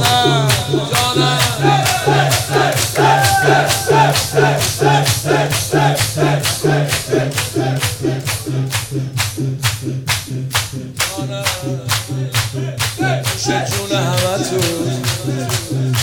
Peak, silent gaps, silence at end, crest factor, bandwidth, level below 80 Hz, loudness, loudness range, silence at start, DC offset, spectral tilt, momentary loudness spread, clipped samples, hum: 0 dBFS; none; 0 s; 14 dB; over 20 kHz; -44 dBFS; -15 LUFS; 6 LU; 0 s; under 0.1%; -4 dB/octave; 7 LU; under 0.1%; none